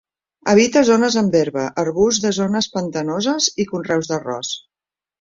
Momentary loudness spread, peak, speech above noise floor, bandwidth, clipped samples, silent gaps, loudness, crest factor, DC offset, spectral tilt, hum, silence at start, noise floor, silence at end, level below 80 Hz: 11 LU; -2 dBFS; over 73 dB; 7.6 kHz; under 0.1%; none; -18 LUFS; 18 dB; under 0.1%; -4 dB/octave; none; 0.45 s; under -90 dBFS; 0.6 s; -54 dBFS